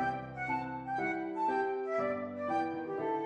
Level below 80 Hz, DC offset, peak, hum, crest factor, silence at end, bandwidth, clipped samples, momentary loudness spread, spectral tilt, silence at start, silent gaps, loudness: -68 dBFS; under 0.1%; -22 dBFS; none; 14 dB; 0 s; 9.4 kHz; under 0.1%; 4 LU; -7 dB/octave; 0 s; none; -35 LUFS